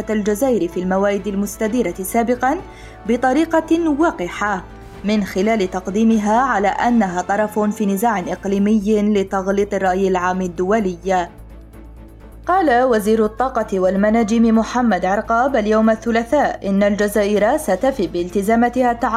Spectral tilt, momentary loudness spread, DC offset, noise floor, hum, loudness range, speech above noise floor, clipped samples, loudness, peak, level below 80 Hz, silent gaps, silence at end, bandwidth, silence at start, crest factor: -6 dB/octave; 6 LU; under 0.1%; -38 dBFS; none; 3 LU; 21 dB; under 0.1%; -17 LUFS; -6 dBFS; -40 dBFS; none; 0 s; 15 kHz; 0 s; 12 dB